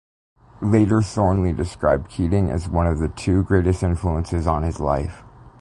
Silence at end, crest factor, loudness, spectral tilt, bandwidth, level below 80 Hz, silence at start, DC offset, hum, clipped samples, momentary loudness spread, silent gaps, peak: 0.1 s; 16 dB; -21 LUFS; -8 dB/octave; 11 kHz; -30 dBFS; 0.6 s; under 0.1%; none; under 0.1%; 5 LU; none; -4 dBFS